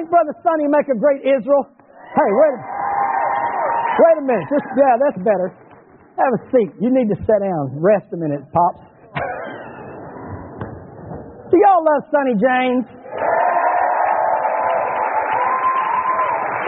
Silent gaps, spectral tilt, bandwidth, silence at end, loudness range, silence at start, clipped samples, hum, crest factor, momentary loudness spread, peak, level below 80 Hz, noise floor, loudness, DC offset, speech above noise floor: none; -1.5 dB/octave; 3.9 kHz; 0 s; 5 LU; 0 s; under 0.1%; none; 16 dB; 18 LU; -2 dBFS; -54 dBFS; -46 dBFS; -17 LUFS; under 0.1%; 30 dB